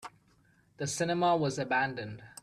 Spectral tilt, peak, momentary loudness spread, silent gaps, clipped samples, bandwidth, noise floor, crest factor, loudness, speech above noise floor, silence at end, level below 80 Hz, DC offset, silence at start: -4.5 dB/octave; -18 dBFS; 15 LU; none; under 0.1%; 13.5 kHz; -66 dBFS; 16 dB; -31 LUFS; 35 dB; 0.1 s; -68 dBFS; under 0.1%; 0 s